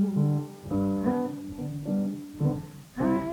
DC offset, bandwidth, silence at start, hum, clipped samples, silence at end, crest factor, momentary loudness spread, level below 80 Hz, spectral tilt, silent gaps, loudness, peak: under 0.1%; 18.5 kHz; 0 s; none; under 0.1%; 0 s; 16 dB; 9 LU; -54 dBFS; -9 dB/octave; none; -30 LUFS; -12 dBFS